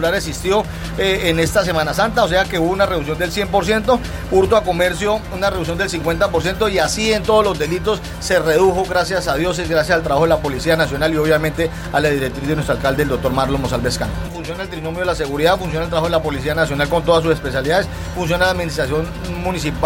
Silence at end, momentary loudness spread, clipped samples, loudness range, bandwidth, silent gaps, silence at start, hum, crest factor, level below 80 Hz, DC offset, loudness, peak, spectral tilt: 0 s; 6 LU; under 0.1%; 3 LU; 17 kHz; none; 0 s; none; 14 dB; -32 dBFS; under 0.1%; -17 LUFS; -2 dBFS; -5 dB/octave